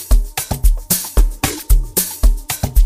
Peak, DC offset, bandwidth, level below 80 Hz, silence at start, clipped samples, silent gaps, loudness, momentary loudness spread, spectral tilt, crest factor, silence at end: 0 dBFS; under 0.1%; 15.5 kHz; -14 dBFS; 0 s; under 0.1%; none; -18 LUFS; 5 LU; -3.5 dB/octave; 14 dB; 0 s